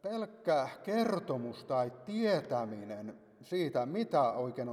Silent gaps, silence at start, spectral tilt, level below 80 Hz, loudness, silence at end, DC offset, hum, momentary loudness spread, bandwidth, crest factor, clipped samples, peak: none; 0.05 s; -6.5 dB/octave; -80 dBFS; -34 LUFS; 0 s; under 0.1%; none; 10 LU; 14 kHz; 16 dB; under 0.1%; -18 dBFS